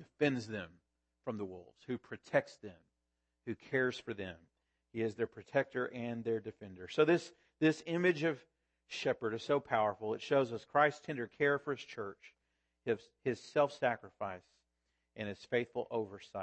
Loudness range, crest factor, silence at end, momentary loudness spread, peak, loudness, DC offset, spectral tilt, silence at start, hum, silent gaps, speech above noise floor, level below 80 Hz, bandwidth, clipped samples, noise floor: 6 LU; 22 dB; 0 s; 15 LU; -14 dBFS; -36 LUFS; under 0.1%; -6 dB/octave; 0 s; none; none; 49 dB; -78 dBFS; 8.4 kHz; under 0.1%; -86 dBFS